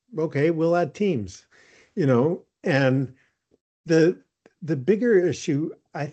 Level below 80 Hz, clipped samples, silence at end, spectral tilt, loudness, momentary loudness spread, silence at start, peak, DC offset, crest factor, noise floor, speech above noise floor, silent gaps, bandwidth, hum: -68 dBFS; under 0.1%; 0 s; -7 dB/octave; -23 LUFS; 13 LU; 0.15 s; -6 dBFS; under 0.1%; 16 dB; -44 dBFS; 22 dB; 3.61-3.84 s; 8.6 kHz; none